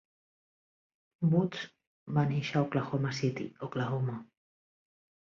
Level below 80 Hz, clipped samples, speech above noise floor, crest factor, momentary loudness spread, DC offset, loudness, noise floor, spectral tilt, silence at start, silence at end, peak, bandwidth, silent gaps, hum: -70 dBFS; under 0.1%; over 59 dB; 18 dB; 11 LU; under 0.1%; -32 LUFS; under -90 dBFS; -7 dB/octave; 1.2 s; 1 s; -16 dBFS; 7.4 kHz; 1.87-2.06 s; none